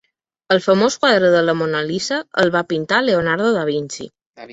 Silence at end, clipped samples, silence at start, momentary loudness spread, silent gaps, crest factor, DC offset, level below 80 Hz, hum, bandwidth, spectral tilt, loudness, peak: 0 s; under 0.1%; 0.5 s; 8 LU; 4.26-4.34 s; 16 dB; under 0.1%; -58 dBFS; none; 8 kHz; -4.5 dB/octave; -17 LUFS; -2 dBFS